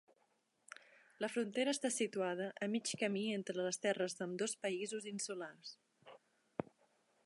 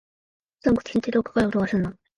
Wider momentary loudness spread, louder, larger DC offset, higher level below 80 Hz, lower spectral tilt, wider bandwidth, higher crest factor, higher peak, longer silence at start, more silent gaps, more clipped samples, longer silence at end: first, 18 LU vs 4 LU; second, -40 LUFS vs -24 LUFS; neither; second, -88 dBFS vs -50 dBFS; second, -3.5 dB/octave vs -7.5 dB/octave; about the same, 11.5 kHz vs 11 kHz; about the same, 20 dB vs 18 dB; second, -22 dBFS vs -8 dBFS; first, 1.2 s vs 0.65 s; neither; neither; first, 0.6 s vs 0.25 s